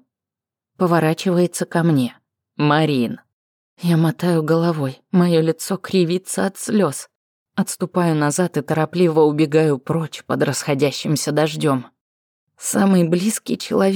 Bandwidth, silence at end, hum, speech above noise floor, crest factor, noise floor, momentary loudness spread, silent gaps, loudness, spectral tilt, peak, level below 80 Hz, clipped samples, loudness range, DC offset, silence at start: 19.5 kHz; 0 s; none; 70 dB; 14 dB; -88 dBFS; 9 LU; 3.33-3.77 s, 7.15-7.46 s, 12.01-12.47 s; -19 LUFS; -5.5 dB/octave; -4 dBFS; -72 dBFS; under 0.1%; 2 LU; under 0.1%; 0.8 s